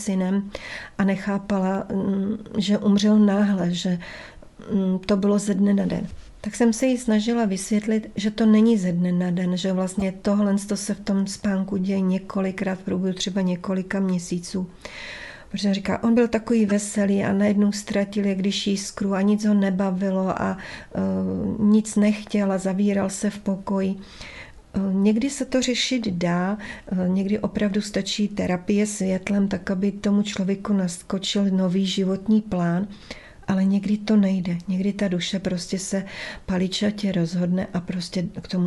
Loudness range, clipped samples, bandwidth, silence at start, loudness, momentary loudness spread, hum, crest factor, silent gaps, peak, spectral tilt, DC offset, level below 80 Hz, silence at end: 3 LU; under 0.1%; 12 kHz; 0 s; -23 LUFS; 8 LU; none; 16 dB; none; -8 dBFS; -6 dB/octave; under 0.1%; -50 dBFS; 0 s